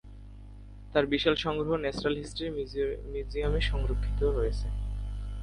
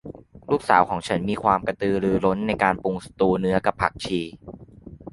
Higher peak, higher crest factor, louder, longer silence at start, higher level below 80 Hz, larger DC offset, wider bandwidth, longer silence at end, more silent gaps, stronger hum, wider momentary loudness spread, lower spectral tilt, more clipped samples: second, -10 dBFS vs -2 dBFS; about the same, 20 dB vs 22 dB; second, -31 LUFS vs -23 LUFS; about the same, 0.05 s vs 0.05 s; first, -34 dBFS vs -48 dBFS; neither; about the same, 10.5 kHz vs 11.5 kHz; about the same, 0 s vs 0.05 s; neither; first, 50 Hz at -40 dBFS vs none; first, 23 LU vs 19 LU; about the same, -6 dB/octave vs -6.5 dB/octave; neither